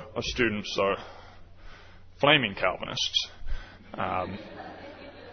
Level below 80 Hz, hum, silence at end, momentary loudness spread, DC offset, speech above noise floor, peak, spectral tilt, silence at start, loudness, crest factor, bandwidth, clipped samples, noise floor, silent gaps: -46 dBFS; none; 0 s; 22 LU; under 0.1%; 20 dB; -6 dBFS; -3.5 dB/octave; 0 s; -27 LUFS; 24 dB; 6.6 kHz; under 0.1%; -48 dBFS; none